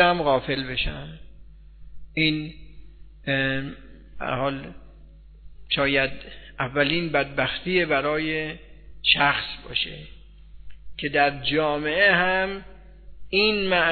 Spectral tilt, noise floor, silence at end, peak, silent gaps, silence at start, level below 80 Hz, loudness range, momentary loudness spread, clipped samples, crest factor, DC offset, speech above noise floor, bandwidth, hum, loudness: -8 dB/octave; -46 dBFS; 0 s; -4 dBFS; none; 0 s; -44 dBFS; 6 LU; 18 LU; under 0.1%; 22 dB; under 0.1%; 23 dB; 4.6 kHz; none; -23 LUFS